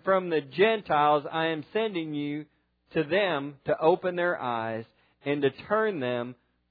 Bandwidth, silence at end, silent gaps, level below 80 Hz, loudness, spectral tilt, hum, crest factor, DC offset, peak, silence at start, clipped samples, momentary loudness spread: 4.9 kHz; 0.35 s; none; -70 dBFS; -27 LUFS; -9 dB/octave; none; 18 dB; under 0.1%; -8 dBFS; 0.05 s; under 0.1%; 10 LU